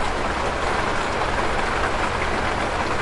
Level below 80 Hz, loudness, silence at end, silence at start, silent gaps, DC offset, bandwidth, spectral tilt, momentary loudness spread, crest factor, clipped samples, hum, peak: -32 dBFS; -23 LUFS; 0 s; 0 s; none; under 0.1%; 11.5 kHz; -4 dB/octave; 1 LU; 14 dB; under 0.1%; none; -10 dBFS